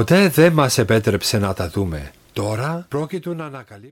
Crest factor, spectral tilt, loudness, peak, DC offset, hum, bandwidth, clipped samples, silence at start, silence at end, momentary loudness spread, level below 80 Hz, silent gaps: 16 dB; -5.5 dB/octave; -19 LUFS; -4 dBFS; under 0.1%; none; 17 kHz; under 0.1%; 0 s; 0.05 s; 17 LU; -44 dBFS; none